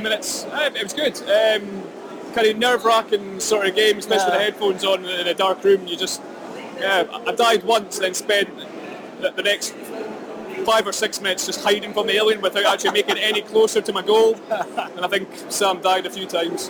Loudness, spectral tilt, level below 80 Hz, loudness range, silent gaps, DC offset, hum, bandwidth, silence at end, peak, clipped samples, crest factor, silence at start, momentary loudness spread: -20 LUFS; -2 dB/octave; -64 dBFS; 3 LU; none; under 0.1%; none; over 20 kHz; 0 s; -6 dBFS; under 0.1%; 16 dB; 0 s; 14 LU